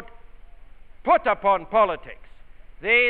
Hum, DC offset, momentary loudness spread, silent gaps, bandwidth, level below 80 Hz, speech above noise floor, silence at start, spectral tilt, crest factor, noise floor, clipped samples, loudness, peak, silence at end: none; under 0.1%; 13 LU; none; 4.5 kHz; -46 dBFS; 22 dB; 0 s; -6.5 dB/octave; 16 dB; -42 dBFS; under 0.1%; -22 LUFS; -6 dBFS; 0 s